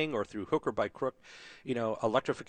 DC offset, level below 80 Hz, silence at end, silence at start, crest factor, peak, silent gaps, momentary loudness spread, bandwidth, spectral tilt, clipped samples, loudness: under 0.1%; -66 dBFS; 0.05 s; 0 s; 20 dB; -14 dBFS; none; 15 LU; 9.4 kHz; -6 dB/octave; under 0.1%; -33 LUFS